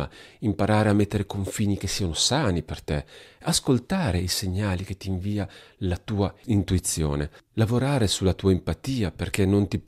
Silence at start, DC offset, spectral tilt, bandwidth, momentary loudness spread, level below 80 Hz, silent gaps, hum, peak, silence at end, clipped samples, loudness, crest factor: 0 s; under 0.1%; -5 dB/octave; 15 kHz; 9 LU; -42 dBFS; none; none; -2 dBFS; 0.05 s; under 0.1%; -25 LUFS; 22 dB